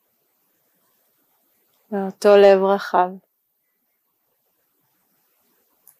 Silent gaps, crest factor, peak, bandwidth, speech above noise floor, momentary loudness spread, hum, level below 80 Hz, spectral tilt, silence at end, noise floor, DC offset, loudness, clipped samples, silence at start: none; 20 dB; -2 dBFS; 15 kHz; 55 dB; 16 LU; none; -78 dBFS; -6 dB/octave; 2.85 s; -71 dBFS; under 0.1%; -17 LUFS; under 0.1%; 1.9 s